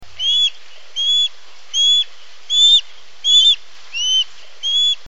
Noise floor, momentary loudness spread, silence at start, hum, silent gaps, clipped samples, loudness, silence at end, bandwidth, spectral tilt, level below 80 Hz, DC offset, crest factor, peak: -36 dBFS; 14 LU; 0 s; none; none; under 0.1%; -13 LUFS; 0.15 s; 7.8 kHz; 4 dB/octave; -62 dBFS; 3%; 14 dB; -4 dBFS